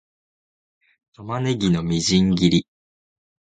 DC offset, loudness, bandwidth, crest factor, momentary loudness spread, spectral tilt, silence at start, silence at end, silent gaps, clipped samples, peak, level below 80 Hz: under 0.1%; -20 LUFS; 9.2 kHz; 20 dB; 10 LU; -5.5 dB/octave; 1.2 s; 0.8 s; none; under 0.1%; -4 dBFS; -46 dBFS